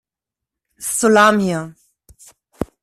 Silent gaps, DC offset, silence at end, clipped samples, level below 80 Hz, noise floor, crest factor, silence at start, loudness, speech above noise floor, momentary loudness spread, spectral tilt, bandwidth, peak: none; under 0.1%; 0.2 s; under 0.1%; -50 dBFS; -86 dBFS; 18 dB; 0.8 s; -15 LUFS; 71 dB; 18 LU; -4 dB/octave; 14.5 kHz; -2 dBFS